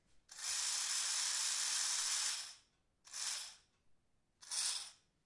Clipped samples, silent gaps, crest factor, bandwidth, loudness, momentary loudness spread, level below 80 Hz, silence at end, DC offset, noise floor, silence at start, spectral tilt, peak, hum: under 0.1%; none; 18 dB; 11.5 kHz; -37 LUFS; 15 LU; -84 dBFS; 0.3 s; under 0.1%; -74 dBFS; 0.3 s; 4.5 dB/octave; -24 dBFS; none